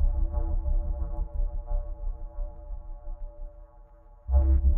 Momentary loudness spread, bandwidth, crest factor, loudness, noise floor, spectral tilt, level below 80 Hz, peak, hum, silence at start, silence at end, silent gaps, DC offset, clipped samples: 19 LU; 1.6 kHz; 14 dB; -32 LUFS; -51 dBFS; -13.5 dB/octave; -28 dBFS; -12 dBFS; none; 0 s; 0 s; none; under 0.1%; under 0.1%